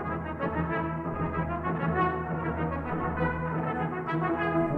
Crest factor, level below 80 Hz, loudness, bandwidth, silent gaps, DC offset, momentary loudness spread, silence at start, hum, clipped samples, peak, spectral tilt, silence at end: 16 dB; -44 dBFS; -30 LUFS; 4.4 kHz; none; under 0.1%; 4 LU; 0 s; none; under 0.1%; -14 dBFS; -10 dB/octave; 0 s